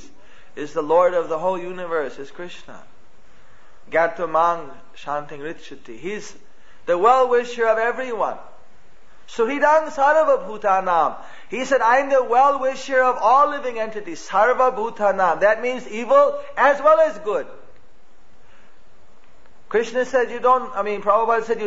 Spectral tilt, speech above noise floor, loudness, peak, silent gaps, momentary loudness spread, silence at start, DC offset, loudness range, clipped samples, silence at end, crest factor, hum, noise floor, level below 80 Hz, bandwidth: -4 dB/octave; 35 dB; -19 LUFS; -4 dBFS; none; 18 LU; 0.55 s; 2%; 7 LU; under 0.1%; 0 s; 18 dB; none; -55 dBFS; -58 dBFS; 8 kHz